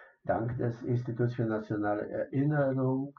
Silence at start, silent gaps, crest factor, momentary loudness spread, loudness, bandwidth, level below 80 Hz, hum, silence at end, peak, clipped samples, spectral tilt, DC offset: 0 s; none; 16 dB; 5 LU; -32 LUFS; 6.2 kHz; -64 dBFS; none; 0.05 s; -16 dBFS; under 0.1%; -9 dB/octave; under 0.1%